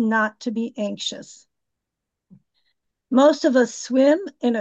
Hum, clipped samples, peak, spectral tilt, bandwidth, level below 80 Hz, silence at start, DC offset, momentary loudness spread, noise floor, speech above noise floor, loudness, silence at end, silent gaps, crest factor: none; under 0.1%; -6 dBFS; -4 dB/octave; 8.4 kHz; -76 dBFS; 0 s; under 0.1%; 11 LU; -83 dBFS; 63 dB; -20 LUFS; 0 s; none; 16 dB